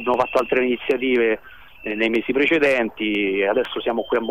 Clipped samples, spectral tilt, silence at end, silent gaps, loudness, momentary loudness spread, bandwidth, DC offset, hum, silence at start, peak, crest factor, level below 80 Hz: under 0.1%; -5.5 dB/octave; 0 s; none; -20 LUFS; 6 LU; 14.5 kHz; 0.4%; none; 0 s; -6 dBFS; 14 dB; -54 dBFS